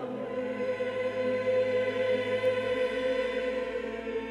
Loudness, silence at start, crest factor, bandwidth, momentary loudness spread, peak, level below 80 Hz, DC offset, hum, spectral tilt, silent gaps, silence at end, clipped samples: -30 LUFS; 0 s; 12 dB; 10.5 kHz; 7 LU; -18 dBFS; -60 dBFS; under 0.1%; none; -5.5 dB/octave; none; 0 s; under 0.1%